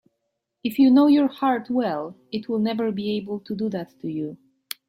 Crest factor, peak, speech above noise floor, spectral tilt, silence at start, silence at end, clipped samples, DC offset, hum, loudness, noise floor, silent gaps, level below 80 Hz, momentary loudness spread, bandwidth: 14 dB; -8 dBFS; 56 dB; -6.5 dB/octave; 0.65 s; 0.55 s; under 0.1%; under 0.1%; none; -23 LUFS; -78 dBFS; none; -68 dBFS; 15 LU; 16 kHz